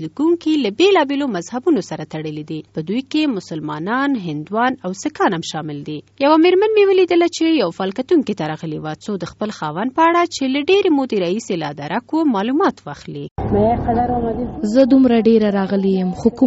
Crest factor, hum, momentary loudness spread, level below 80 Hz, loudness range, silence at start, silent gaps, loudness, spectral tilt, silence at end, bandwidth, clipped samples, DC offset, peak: 16 dB; none; 13 LU; -42 dBFS; 5 LU; 0 s; 13.31-13.36 s; -17 LUFS; -4.5 dB/octave; 0 s; 8 kHz; under 0.1%; under 0.1%; 0 dBFS